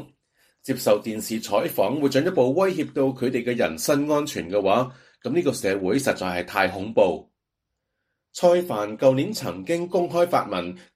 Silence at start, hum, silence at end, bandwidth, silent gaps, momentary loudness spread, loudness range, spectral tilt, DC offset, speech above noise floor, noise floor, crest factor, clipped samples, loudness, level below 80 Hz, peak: 0 s; none; 0.15 s; 15.5 kHz; none; 8 LU; 2 LU; -5 dB/octave; under 0.1%; 59 dB; -81 dBFS; 20 dB; under 0.1%; -23 LUFS; -62 dBFS; -4 dBFS